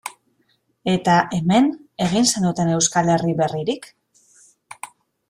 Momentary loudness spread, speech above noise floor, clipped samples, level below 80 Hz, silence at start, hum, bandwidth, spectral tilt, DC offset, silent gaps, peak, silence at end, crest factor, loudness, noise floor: 19 LU; 47 dB; under 0.1%; -56 dBFS; 0.05 s; none; 15.5 kHz; -4.5 dB/octave; under 0.1%; none; -4 dBFS; 0.45 s; 18 dB; -19 LUFS; -65 dBFS